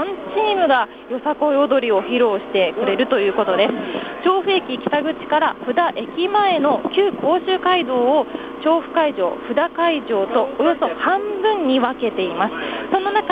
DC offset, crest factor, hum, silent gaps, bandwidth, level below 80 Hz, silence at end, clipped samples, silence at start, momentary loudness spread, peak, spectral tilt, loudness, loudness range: under 0.1%; 16 dB; none; none; 5 kHz; -58 dBFS; 0 s; under 0.1%; 0 s; 5 LU; -4 dBFS; -6.5 dB/octave; -19 LUFS; 1 LU